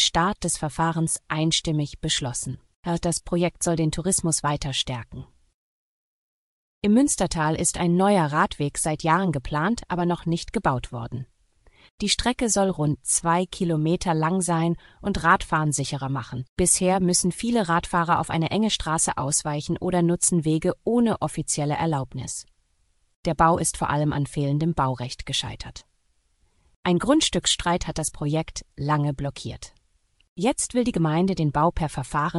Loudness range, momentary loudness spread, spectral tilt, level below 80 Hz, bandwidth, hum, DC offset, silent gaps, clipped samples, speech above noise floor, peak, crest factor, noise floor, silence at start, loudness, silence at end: 4 LU; 10 LU; -4 dB/octave; -44 dBFS; 13.5 kHz; none; under 0.1%; 2.75-2.83 s, 5.54-6.82 s, 11.91-11.98 s, 16.49-16.57 s, 23.16-23.23 s, 26.76-26.83 s, 30.28-30.36 s; under 0.1%; 43 dB; -4 dBFS; 22 dB; -67 dBFS; 0 s; -23 LUFS; 0 s